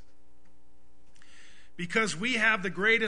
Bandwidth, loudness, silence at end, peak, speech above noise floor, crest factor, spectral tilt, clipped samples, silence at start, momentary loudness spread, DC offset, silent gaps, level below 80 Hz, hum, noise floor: 10.5 kHz; -27 LUFS; 0 s; -10 dBFS; 37 dB; 20 dB; -3.5 dB/octave; under 0.1%; 1.8 s; 6 LU; 1%; none; -64 dBFS; none; -64 dBFS